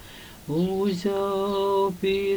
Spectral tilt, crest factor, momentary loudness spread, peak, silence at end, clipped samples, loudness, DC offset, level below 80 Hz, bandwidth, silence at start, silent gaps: -6.5 dB/octave; 12 dB; 8 LU; -14 dBFS; 0 s; under 0.1%; -25 LUFS; under 0.1%; -52 dBFS; over 20 kHz; 0 s; none